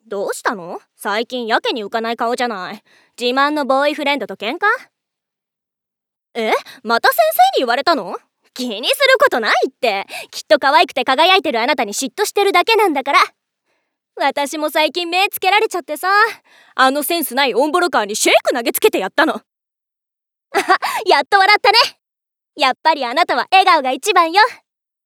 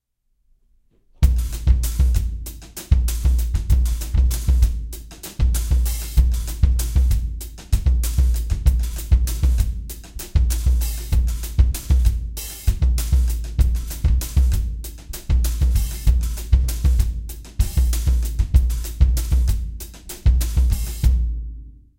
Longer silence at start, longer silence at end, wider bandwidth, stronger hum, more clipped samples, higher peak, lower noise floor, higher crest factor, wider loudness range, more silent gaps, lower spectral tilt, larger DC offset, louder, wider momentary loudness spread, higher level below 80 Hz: second, 0.1 s vs 1.2 s; first, 0.5 s vs 0.3 s; first, 19.5 kHz vs 17 kHz; neither; neither; about the same, 0 dBFS vs -2 dBFS; first, -83 dBFS vs -65 dBFS; about the same, 16 dB vs 16 dB; first, 5 LU vs 1 LU; neither; second, -1.5 dB/octave vs -5.5 dB/octave; neither; first, -15 LUFS vs -21 LUFS; about the same, 11 LU vs 12 LU; second, -72 dBFS vs -20 dBFS